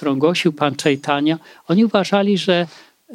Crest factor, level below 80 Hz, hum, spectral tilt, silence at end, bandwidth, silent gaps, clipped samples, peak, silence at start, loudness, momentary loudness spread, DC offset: 16 dB; -68 dBFS; none; -5.5 dB/octave; 0 s; 14.5 kHz; none; under 0.1%; -2 dBFS; 0 s; -18 LUFS; 5 LU; under 0.1%